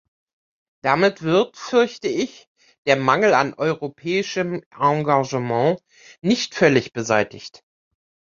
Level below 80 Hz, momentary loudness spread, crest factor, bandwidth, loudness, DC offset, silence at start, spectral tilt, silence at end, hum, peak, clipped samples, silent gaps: -62 dBFS; 10 LU; 20 dB; 7.6 kHz; -20 LUFS; under 0.1%; 0.85 s; -5 dB/octave; 0.9 s; none; -2 dBFS; under 0.1%; 2.47-2.55 s, 2.78-2.85 s, 4.66-4.71 s